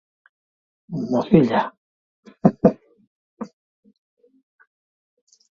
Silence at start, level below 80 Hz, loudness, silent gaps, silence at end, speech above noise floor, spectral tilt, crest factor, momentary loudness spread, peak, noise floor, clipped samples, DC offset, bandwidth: 0.9 s; -56 dBFS; -20 LUFS; 1.77-2.23 s, 3.07-3.37 s; 2.15 s; over 72 dB; -9 dB/octave; 24 dB; 21 LU; 0 dBFS; under -90 dBFS; under 0.1%; under 0.1%; 7 kHz